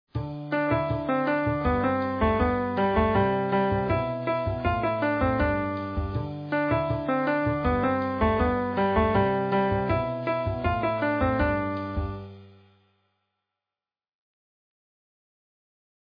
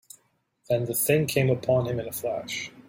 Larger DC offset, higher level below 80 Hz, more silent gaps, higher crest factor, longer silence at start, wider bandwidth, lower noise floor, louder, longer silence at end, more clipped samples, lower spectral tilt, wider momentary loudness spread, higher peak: neither; first, -40 dBFS vs -60 dBFS; neither; about the same, 16 dB vs 18 dB; second, 0.15 s vs 0.7 s; second, 5.2 kHz vs 16.5 kHz; first, under -90 dBFS vs -69 dBFS; about the same, -26 LUFS vs -26 LUFS; first, 3.7 s vs 0.1 s; neither; first, -10 dB/octave vs -5 dB/octave; about the same, 7 LU vs 8 LU; about the same, -10 dBFS vs -8 dBFS